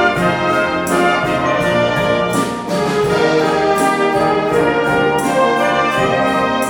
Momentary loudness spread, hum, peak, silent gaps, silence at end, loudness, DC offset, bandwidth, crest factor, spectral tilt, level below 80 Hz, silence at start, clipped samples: 2 LU; none; -2 dBFS; none; 0 s; -15 LUFS; under 0.1%; 18.5 kHz; 14 dB; -5 dB/octave; -42 dBFS; 0 s; under 0.1%